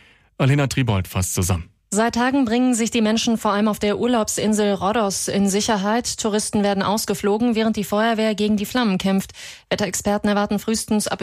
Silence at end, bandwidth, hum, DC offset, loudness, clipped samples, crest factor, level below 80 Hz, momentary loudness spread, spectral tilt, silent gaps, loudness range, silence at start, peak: 0 s; 15.5 kHz; none; under 0.1%; -20 LUFS; under 0.1%; 12 dB; -46 dBFS; 4 LU; -4.5 dB/octave; none; 2 LU; 0.4 s; -8 dBFS